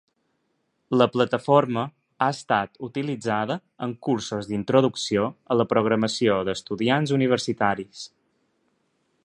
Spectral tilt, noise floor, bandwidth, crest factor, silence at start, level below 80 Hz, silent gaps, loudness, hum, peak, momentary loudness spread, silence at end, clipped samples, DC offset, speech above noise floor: -5.5 dB/octave; -73 dBFS; 11 kHz; 22 dB; 0.9 s; -62 dBFS; none; -24 LUFS; none; -4 dBFS; 10 LU; 1.15 s; under 0.1%; under 0.1%; 49 dB